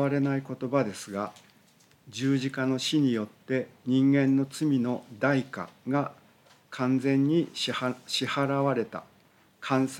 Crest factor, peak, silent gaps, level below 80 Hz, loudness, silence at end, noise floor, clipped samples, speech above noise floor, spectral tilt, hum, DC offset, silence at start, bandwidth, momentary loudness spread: 16 dB; -12 dBFS; none; -80 dBFS; -28 LUFS; 0 s; -61 dBFS; under 0.1%; 34 dB; -6 dB/octave; none; under 0.1%; 0 s; 13.5 kHz; 12 LU